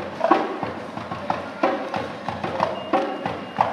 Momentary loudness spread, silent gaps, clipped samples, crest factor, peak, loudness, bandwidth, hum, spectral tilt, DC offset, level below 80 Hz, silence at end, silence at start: 9 LU; none; under 0.1%; 22 dB; -2 dBFS; -25 LUFS; 12.5 kHz; none; -6 dB/octave; under 0.1%; -64 dBFS; 0 s; 0 s